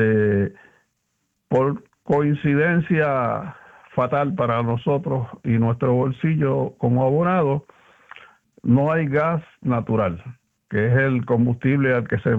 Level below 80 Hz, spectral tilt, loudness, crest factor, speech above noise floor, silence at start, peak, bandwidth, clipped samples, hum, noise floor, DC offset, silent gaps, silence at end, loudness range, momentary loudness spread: -54 dBFS; -10 dB/octave; -21 LUFS; 16 dB; 53 dB; 0 s; -6 dBFS; 4 kHz; under 0.1%; none; -73 dBFS; under 0.1%; none; 0 s; 1 LU; 7 LU